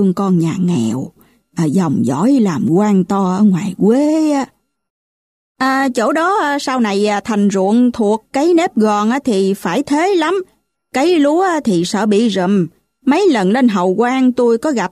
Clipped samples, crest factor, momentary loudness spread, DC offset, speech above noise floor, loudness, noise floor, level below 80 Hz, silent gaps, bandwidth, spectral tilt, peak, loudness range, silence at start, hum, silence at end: under 0.1%; 12 dB; 5 LU; under 0.1%; over 77 dB; -14 LUFS; under -90 dBFS; -56 dBFS; 4.90-5.55 s; 13.5 kHz; -6 dB/octave; -2 dBFS; 2 LU; 0 s; none; 0.05 s